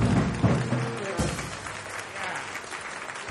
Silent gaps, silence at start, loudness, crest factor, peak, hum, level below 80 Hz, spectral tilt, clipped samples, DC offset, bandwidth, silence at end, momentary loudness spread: none; 0 s; -29 LUFS; 18 dB; -10 dBFS; none; -44 dBFS; -5.5 dB/octave; under 0.1%; under 0.1%; 12 kHz; 0 s; 10 LU